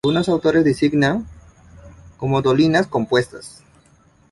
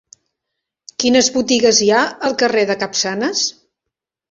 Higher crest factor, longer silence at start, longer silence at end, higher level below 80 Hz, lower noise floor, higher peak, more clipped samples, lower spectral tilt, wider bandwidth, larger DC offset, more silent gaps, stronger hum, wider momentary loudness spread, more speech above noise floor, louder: about the same, 16 dB vs 18 dB; second, 0.05 s vs 1 s; about the same, 0.8 s vs 0.8 s; first, -48 dBFS vs -56 dBFS; second, -54 dBFS vs -82 dBFS; about the same, -2 dBFS vs 0 dBFS; neither; first, -6.5 dB/octave vs -2 dB/octave; first, 11.5 kHz vs 7.8 kHz; neither; neither; neither; first, 16 LU vs 7 LU; second, 37 dB vs 66 dB; second, -18 LUFS vs -15 LUFS